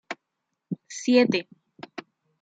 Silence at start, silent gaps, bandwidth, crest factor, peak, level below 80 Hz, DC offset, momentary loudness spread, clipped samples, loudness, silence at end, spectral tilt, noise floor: 0.1 s; none; 9 kHz; 20 dB; -8 dBFS; -76 dBFS; under 0.1%; 22 LU; under 0.1%; -23 LUFS; 1 s; -4.5 dB/octave; -81 dBFS